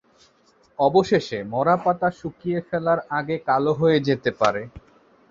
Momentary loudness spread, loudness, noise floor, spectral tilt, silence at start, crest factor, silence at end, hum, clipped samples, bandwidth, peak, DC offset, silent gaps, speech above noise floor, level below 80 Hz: 9 LU; -22 LUFS; -59 dBFS; -6.5 dB/octave; 0.8 s; 20 dB; 0.5 s; none; under 0.1%; 7.6 kHz; -4 dBFS; under 0.1%; none; 38 dB; -56 dBFS